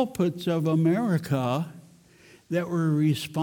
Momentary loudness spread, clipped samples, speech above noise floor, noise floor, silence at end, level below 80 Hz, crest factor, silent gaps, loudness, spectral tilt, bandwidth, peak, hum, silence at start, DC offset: 7 LU; under 0.1%; 30 dB; -55 dBFS; 0 s; -66 dBFS; 14 dB; none; -26 LUFS; -7 dB/octave; 17.5 kHz; -12 dBFS; none; 0 s; under 0.1%